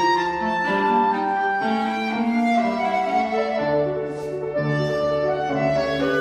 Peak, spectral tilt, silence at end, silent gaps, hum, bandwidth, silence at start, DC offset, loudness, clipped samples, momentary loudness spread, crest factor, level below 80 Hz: -8 dBFS; -6.5 dB/octave; 0 s; none; none; 11 kHz; 0 s; under 0.1%; -22 LUFS; under 0.1%; 4 LU; 12 dB; -52 dBFS